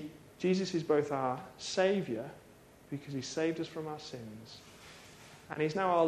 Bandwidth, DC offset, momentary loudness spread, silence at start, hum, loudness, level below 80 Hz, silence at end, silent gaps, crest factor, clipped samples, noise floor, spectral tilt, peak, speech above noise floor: 14 kHz; under 0.1%; 21 LU; 0 s; none; -35 LUFS; -70 dBFS; 0 s; none; 20 dB; under 0.1%; -58 dBFS; -5.5 dB/octave; -16 dBFS; 25 dB